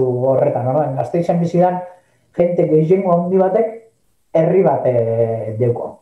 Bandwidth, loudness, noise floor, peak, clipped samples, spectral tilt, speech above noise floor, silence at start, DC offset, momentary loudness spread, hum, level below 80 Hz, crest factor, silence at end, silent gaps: 8.2 kHz; -16 LUFS; -56 dBFS; -4 dBFS; under 0.1%; -10 dB/octave; 41 dB; 0 s; under 0.1%; 6 LU; none; -58 dBFS; 12 dB; 0.05 s; none